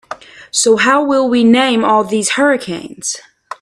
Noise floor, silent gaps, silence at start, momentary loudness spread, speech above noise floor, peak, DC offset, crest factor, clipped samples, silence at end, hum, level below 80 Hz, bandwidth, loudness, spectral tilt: -32 dBFS; none; 0.1 s; 16 LU; 20 dB; 0 dBFS; under 0.1%; 14 dB; under 0.1%; 0.05 s; none; -58 dBFS; 13 kHz; -13 LUFS; -3 dB/octave